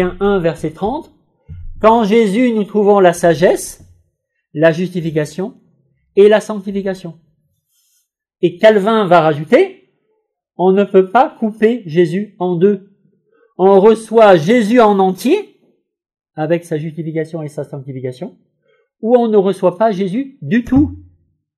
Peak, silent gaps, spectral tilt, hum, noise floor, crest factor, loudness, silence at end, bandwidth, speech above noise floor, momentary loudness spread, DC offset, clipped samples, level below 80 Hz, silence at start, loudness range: 0 dBFS; none; -6.5 dB/octave; none; -68 dBFS; 14 dB; -13 LUFS; 0.6 s; 13.5 kHz; 55 dB; 15 LU; under 0.1%; under 0.1%; -44 dBFS; 0 s; 6 LU